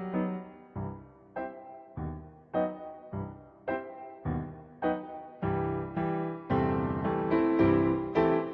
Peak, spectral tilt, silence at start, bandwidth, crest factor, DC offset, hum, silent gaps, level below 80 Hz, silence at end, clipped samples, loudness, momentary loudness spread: -12 dBFS; -10.5 dB/octave; 0 s; 5.4 kHz; 18 dB; under 0.1%; none; none; -52 dBFS; 0 s; under 0.1%; -32 LUFS; 17 LU